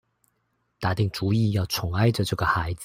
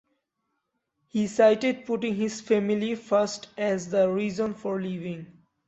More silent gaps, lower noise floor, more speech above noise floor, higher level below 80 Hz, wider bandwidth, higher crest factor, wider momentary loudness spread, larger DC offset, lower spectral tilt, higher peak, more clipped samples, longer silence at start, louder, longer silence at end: neither; second, -73 dBFS vs -79 dBFS; second, 49 dB vs 54 dB; first, -48 dBFS vs -68 dBFS; first, 16 kHz vs 8.2 kHz; about the same, 18 dB vs 20 dB; second, 4 LU vs 11 LU; neither; about the same, -6 dB/octave vs -5.5 dB/octave; about the same, -8 dBFS vs -8 dBFS; neither; second, 0.8 s vs 1.15 s; about the same, -25 LUFS vs -26 LUFS; second, 0 s vs 0.4 s